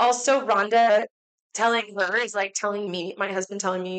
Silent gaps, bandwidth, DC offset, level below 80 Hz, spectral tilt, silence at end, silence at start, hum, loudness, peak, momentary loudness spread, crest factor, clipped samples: 1.11-1.50 s; 9.2 kHz; under 0.1%; -80 dBFS; -2.5 dB/octave; 0 s; 0 s; none; -23 LUFS; -12 dBFS; 10 LU; 12 dB; under 0.1%